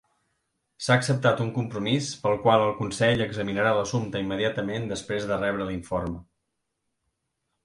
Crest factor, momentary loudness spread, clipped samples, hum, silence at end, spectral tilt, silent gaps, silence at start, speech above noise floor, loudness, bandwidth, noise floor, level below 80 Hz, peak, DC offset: 20 dB; 9 LU; under 0.1%; none; 1.45 s; -5.5 dB/octave; none; 0.8 s; 54 dB; -26 LUFS; 11.5 kHz; -79 dBFS; -52 dBFS; -6 dBFS; under 0.1%